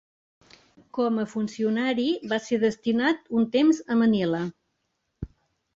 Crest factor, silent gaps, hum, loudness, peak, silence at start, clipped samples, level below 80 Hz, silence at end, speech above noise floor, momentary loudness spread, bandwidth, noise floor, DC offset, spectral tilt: 16 dB; none; none; -25 LUFS; -10 dBFS; 0.95 s; under 0.1%; -56 dBFS; 0.5 s; 53 dB; 14 LU; 7.8 kHz; -77 dBFS; under 0.1%; -6 dB/octave